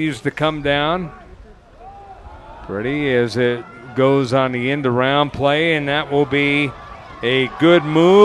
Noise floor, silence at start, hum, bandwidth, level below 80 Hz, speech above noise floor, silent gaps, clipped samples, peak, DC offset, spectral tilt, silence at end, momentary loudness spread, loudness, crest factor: -42 dBFS; 0 s; none; 11.5 kHz; -46 dBFS; 26 dB; none; under 0.1%; 0 dBFS; under 0.1%; -6.5 dB/octave; 0 s; 12 LU; -17 LUFS; 16 dB